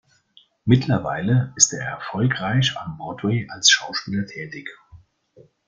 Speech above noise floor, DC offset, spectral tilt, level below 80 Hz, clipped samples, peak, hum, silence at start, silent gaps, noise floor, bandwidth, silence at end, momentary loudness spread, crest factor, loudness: 35 dB; under 0.1%; -3.5 dB/octave; -54 dBFS; under 0.1%; 0 dBFS; none; 0.65 s; none; -57 dBFS; 9.6 kHz; 0.7 s; 16 LU; 22 dB; -20 LUFS